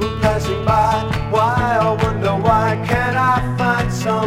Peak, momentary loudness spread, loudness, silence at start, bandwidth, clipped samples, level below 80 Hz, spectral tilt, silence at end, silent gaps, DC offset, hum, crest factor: 0 dBFS; 3 LU; -17 LUFS; 0 s; 16 kHz; under 0.1%; -32 dBFS; -6.5 dB/octave; 0 s; none; under 0.1%; none; 16 dB